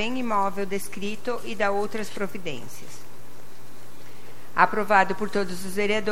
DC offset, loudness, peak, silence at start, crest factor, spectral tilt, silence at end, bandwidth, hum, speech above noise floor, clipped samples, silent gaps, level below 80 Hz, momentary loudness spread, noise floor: 5%; -26 LUFS; 0 dBFS; 0 s; 26 dB; -4.5 dB/octave; 0 s; 16.5 kHz; 60 Hz at -55 dBFS; 22 dB; under 0.1%; none; -62 dBFS; 24 LU; -48 dBFS